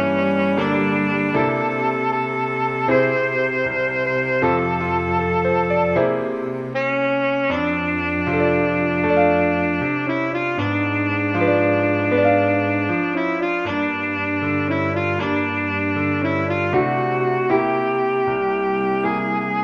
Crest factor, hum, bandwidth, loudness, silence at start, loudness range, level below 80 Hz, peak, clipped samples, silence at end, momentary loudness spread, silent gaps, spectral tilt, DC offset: 14 dB; none; 7 kHz; -20 LUFS; 0 s; 2 LU; -50 dBFS; -4 dBFS; under 0.1%; 0 s; 4 LU; none; -8 dB/octave; under 0.1%